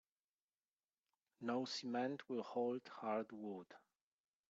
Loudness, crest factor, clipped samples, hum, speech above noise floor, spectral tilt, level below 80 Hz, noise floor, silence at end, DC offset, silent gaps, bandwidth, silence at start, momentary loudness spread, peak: -45 LUFS; 18 dB; under 0.1%; none; over 46 dB; -3.5 dB/octave; under -90 dBFS; under -90 dBFS; 0.75 s; under 0.1%; none; 7.8 kHz; 1.4 s; 9 LU; -28 dBFS